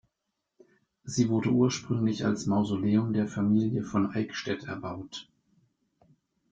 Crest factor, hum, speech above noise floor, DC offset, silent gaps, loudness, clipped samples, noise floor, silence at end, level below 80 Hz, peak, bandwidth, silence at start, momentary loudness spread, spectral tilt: 16 dB; none; 56 dB; under 0.1%; none; -28 LUFS; under 0.1%; -83 dBFS; 1.3 s; -62 dBFS; -12 dBFS; 7.8 kHz; 1.05 s; 12 LU; -6.5 dB/octave